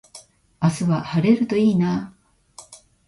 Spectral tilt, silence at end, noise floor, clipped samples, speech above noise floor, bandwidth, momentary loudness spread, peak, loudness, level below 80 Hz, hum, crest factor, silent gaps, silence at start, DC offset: -7.5 dB/octave; 0.3 s; -48 dBFS; under 0.1%; 29 dB; 11.5 kHz; 22 LU; -4 dBFS; -20 LUFS; -56 dBFS; none; 18 dB; none; 0.15 s; under 0.1%